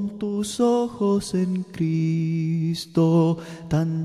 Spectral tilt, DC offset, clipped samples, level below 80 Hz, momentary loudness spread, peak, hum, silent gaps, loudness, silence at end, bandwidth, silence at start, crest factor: -7 dB/octave; under 0.1%; under 0.1%; -54 dBFS; 7 LU; -8 dBFS; none; none; -23 LUFS; 0 s; 12.5 kHz; 0 s; 14 dB